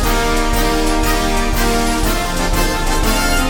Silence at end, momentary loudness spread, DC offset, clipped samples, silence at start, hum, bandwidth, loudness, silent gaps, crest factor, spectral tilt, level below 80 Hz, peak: 0 s; 1 LU; under 0.1%; under 0.1%; 0 s; none; 18 kHz; -16 LUFS; none; 12 dB; -3.5 dB/octave; -18 dBFS; -2 dBFS